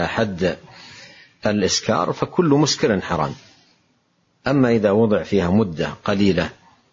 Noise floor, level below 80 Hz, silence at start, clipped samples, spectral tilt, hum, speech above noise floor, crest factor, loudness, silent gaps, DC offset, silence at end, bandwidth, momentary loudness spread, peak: -64 dBFS; -48 dBFS; 0 s; under 0.1%; -5 dB/octave; none; 46 dB; 16 dB; -20 LUFS; none; under 0.1%; 0.4 s; 7.8 kHz; 12 LU; -4 dBFS